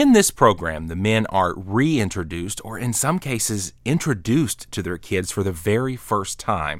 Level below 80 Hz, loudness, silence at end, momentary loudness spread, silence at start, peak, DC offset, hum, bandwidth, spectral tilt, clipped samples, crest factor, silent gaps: -44 dBFS; -22 LUFS; 0 s; 9 LU; 0 s; -2 dBFS; under 0.1%; none; 17 kHz; -4.5 dB/octave; under 0.1%; 20 dB; none